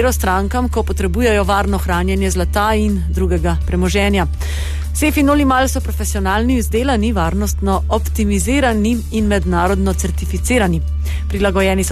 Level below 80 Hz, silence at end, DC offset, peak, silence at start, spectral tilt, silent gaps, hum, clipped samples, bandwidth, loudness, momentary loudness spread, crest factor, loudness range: -20 dBFS; 0 s; under 0.1%; -4 dBFS; 0 s; -5.5 dB/octave; none; none; under 0.1%; 14 kHz; -16 LUFS; 6 LU; 12 dB; 1 LU